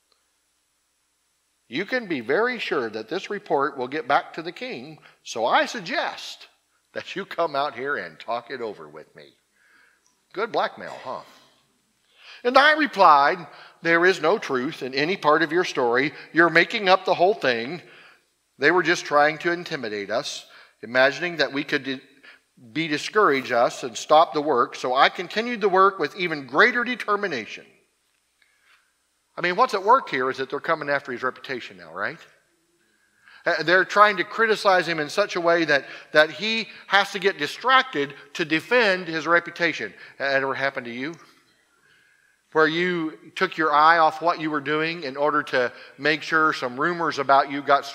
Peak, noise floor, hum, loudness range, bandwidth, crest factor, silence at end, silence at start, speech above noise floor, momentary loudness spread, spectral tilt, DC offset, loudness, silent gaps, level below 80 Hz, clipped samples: 0 dBFS; -70 dBFS; none; 8 LU; 16 kHz; 22 dB; 0 s; 1.7 s; 48 dB; 15 LU; -4 dB/octave; under 0.1%; -22 LUFS; none; -76 dBFS; under 0.1%